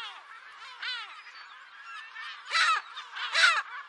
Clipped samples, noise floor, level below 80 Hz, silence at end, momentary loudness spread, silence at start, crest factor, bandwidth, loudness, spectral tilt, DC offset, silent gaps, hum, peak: under 0.1%; -49 dBFS; under -90 dBFS; 0 s; 23 LU; 0 s; 24 dB; 11.5 kHz; -27 LUFS; 5.5 dB/octave; under 0.1%; none; none; -8 dBFS